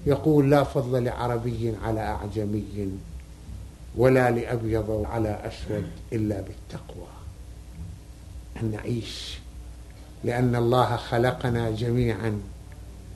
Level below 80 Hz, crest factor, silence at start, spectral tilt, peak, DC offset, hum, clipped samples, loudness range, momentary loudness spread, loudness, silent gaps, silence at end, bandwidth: -42 dBFS; 22 dB; 0 s; -7.5 dB/octave; -4 dBFS; under 0.1%; none; under 0.1%; 9 LU; 22 LU; -26 LUFS; none; 0 s; 12.5 kHz